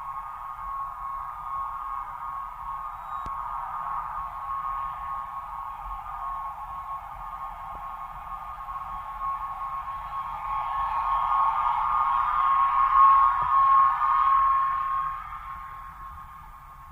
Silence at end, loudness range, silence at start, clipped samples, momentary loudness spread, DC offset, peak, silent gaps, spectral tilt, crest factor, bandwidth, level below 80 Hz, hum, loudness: 0 s; 15 LU; 0 s; under 0.1%; 17 LU; under 0.1%; -10 dBFS; none; -4 dB/octave; 18 dB; 15.5 kHz; -48 dBFS; none; -26 LUFS